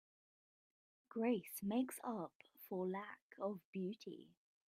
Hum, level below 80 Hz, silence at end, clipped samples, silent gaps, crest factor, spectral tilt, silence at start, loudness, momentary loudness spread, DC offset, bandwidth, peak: none; -88 dBFS; 0.45 s; under 0.1%; 2.35-2.40 s, 3.22-3.30 s, 3.65-3.73 s; 20 dB; -6 dB/octave; 1.15 s; -45 LUFS; 14 LU; under 0.1%; 16 kHz; -26 dBFS